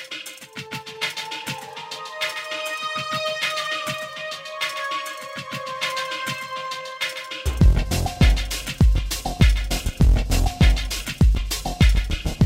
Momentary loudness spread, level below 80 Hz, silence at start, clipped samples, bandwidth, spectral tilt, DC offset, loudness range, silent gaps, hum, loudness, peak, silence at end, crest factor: 12 LU; -24 dBFS; 0 s; under 0.1%; 16 kHz; -4.5 dB/octave; under 0.1%; 7 LU; none; none; -23 LUFS; -4 dBFS; 0 s; 18 dB